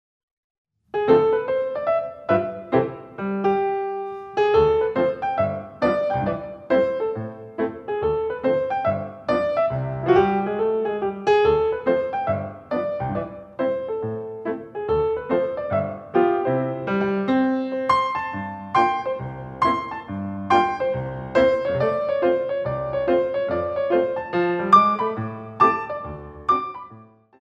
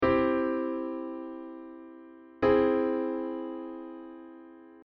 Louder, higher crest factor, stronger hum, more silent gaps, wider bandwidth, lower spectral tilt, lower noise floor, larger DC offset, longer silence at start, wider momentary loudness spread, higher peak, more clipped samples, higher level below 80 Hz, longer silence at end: first, -22 LUFS vs -30 LUFS; about the same, 20 dB vs 18 dB; neither; neither; first, 8.2 kHz vs 5.6 kHz; first, -7.5 dB/octave vs -5 dB/octave; about the same, -47 dBFS vs -50 dBFS; neither; first, 0.95 s vs 0 s; second, 12 LU vs 24 LU; first, -2 dBFS vs -12 dBFS; neither; first, -50 dBFS vs -56 dBFS; first, 0.35 s vs 0 s